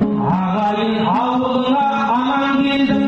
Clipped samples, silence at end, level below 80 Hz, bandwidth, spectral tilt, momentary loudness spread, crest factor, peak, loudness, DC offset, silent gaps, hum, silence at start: under 0.1%; 0 s; -48 dBFS; 7.2 kHz; -7.5 dB/octave; 2 LU; 10 dB; -6 dBFS; -17 LUFS; under 0.1%; none; none; 0 s